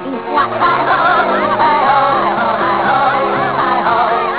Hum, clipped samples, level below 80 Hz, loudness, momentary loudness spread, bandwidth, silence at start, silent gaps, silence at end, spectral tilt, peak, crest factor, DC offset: none; under 0.1%; -48 dBFS; -13 LUFS; 3 LU; 4 kHz; 0 s; none; 0 s; -8.5 dB/octave; -2 dBFS; 10 dB; 0.4%